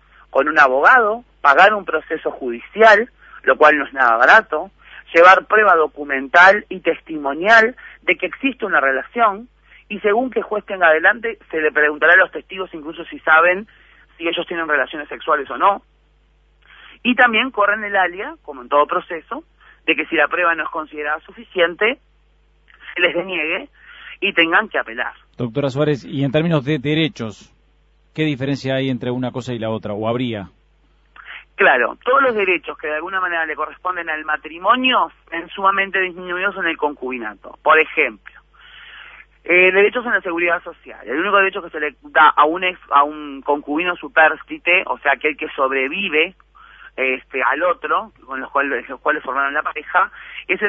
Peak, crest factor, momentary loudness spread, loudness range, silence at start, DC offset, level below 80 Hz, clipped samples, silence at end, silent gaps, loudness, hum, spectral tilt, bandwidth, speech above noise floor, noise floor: 0 dBFS; 18 dB; 15 LU; 8 LU; 0.35 s; under 0.1%; -54 dBFS; under 0.1%; 0 s; none; -16 LUFS; none; -5.5 dB/octave; 8 kHz; 39 dB; -56 dBFS